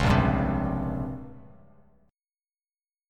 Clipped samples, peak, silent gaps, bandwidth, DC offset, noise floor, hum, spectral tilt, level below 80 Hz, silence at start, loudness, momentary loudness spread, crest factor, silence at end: under 0.1%; -8 dBFS; none; 12 kHz; under 0.1%; under -90 dBFS; none; -7.5 dB/octave; -38 dBFS; 0 s; -27 LUFS; 18 LU; 20 dB; 1.65 s